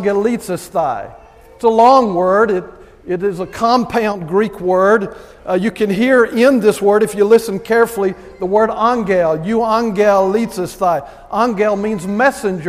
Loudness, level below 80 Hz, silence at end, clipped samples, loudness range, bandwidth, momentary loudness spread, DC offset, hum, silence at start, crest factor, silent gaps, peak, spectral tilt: -15 LUFS; -46 dBFS; 0 s; under 0.1%; 2 LU; 15.5 kHz; 9 LU; under 0.1%; none; 0 s; 14 dB; none; 0 dBFS; -5.5 dB/octave